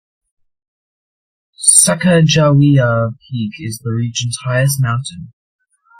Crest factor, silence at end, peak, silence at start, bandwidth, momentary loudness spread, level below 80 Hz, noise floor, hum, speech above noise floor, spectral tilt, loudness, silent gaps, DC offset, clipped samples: 16 dB; 0.75 s; 0 dBFS; 1.6 s; 16.5 kHz; 15 LU; -50 dBFS; under -90 dBFS; none; over 77 dB; -4.5 dB/octave; -13 LUFS; none; under 0.1%; under 0.1%